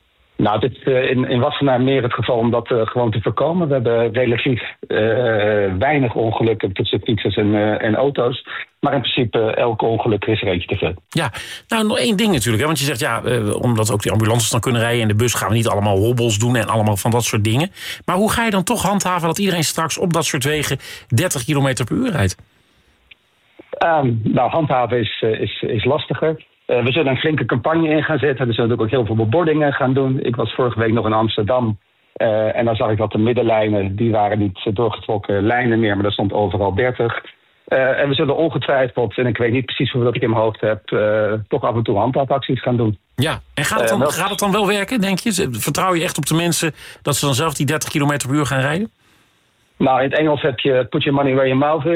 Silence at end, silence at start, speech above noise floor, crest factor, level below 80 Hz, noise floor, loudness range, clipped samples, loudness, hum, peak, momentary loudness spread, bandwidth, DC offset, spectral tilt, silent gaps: 0 s; 0.4 s; 42 dB; 14 dB; -48 dBFS; -59 dBFS; 2 LU; under 0.1%; -18 LUFS; none; -4 dBFS; 5 LU; 16 kHz; under 0.1%; -5 dB/octave; none